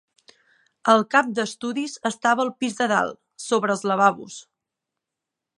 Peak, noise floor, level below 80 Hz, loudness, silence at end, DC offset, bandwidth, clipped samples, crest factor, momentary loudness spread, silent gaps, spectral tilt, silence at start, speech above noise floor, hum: -2 dBFS; -85 dBFS; -74 dBFS; -22 LUFS; 1.2 s; under 0.1%; 11.5 kHz; under 0.1%; 20 dB; 12 LU; none; -4 dB/octave; 0.85 s; 63 dB; none